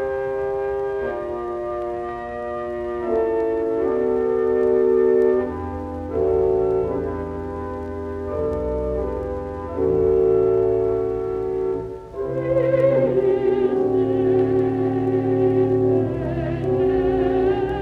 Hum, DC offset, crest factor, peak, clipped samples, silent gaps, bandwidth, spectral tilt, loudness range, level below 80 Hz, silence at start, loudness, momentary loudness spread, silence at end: none; under 0.1%; 14 dB; -8 dBFS; under 0.1%; none; 4.6 kHz; -9.5 dB/octave; 5 LU; -40 dBFS; 0 s; -21 LUFS; 11 LU; 0 s